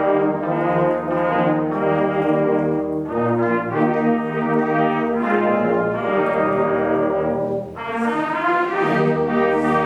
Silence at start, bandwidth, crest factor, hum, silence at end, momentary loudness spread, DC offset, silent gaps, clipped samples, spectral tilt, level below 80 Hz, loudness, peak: 0 s; 9.6 kHz; 14 dB; none; 0 s; 3 LU; under 0.1%; none; under 0.1%; -8.5 dB/octave; -52 dBFS; -19 LUFS; -6 dBFS